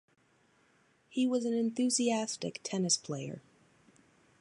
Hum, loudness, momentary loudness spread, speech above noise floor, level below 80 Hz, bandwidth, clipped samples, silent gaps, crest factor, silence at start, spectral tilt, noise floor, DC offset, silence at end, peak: none; -32 LUFS; 11 LU; 37 dB; -82 dBFS; 11.5 kHz; under 0.1%; none; 18 dB; 1.1 s; -3.5 dB/octave; -69 dBFS; under 0.1%; 1 s; -16 dBFS